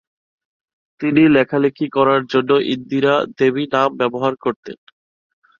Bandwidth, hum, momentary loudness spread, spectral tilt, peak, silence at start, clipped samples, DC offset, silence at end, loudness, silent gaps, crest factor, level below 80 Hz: 7 kHz; none; 11 LU; -7 dB/octave; -2 dBFS; 1 s; under 0.1%; under 0.1%; 0.85 s; -17 LUFS; 4.56-4.63 s; 16 dB; -58 dBFS